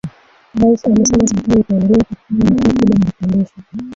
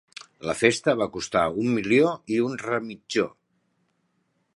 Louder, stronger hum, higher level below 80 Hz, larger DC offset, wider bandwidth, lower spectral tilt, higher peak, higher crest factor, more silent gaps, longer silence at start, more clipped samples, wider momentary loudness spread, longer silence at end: first, -14 LUFS vs -24 LUFS; neither; first, -36 dBFS vs -60 dBFS; neither; second, 7.8 kHz vs 11.5 kHz; first, -6.5 dB/octave vs -5 dB/octave; about the same, -2 dBFS vs -2 dBFS; second, 12 dB vs 24 dB; neither; second, 0.05 s vs 0.4 s; neither; about the same, 10 LU vs 10 LU; second, 0 s vs 1.25 s